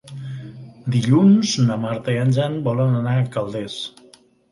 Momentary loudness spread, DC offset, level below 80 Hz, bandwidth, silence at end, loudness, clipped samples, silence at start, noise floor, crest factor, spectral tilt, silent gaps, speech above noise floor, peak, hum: 18 LU; under 0.1%; -58 dBFS; 11.5 kHz; 0.65 s; -19 LUFS; under 0.1%; 0.05 s; -51 dBFS; 16 dB; -6.5 dB/octave; none; 33 dB; -4 dBFS; none